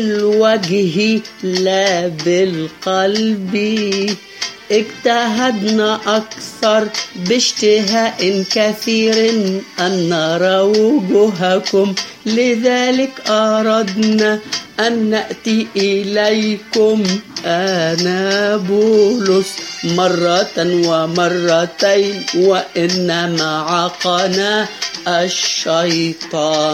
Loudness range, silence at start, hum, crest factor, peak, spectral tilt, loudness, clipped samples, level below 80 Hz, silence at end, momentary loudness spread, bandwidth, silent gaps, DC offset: 2 LU; 0 s; none; 14 dB; 0 dBFS; -4 dB/octave; -15 LUFS; under 0.1%; -60 dBFS; 0 s; 6 LU; 16.5 kHz; none; under 0.1%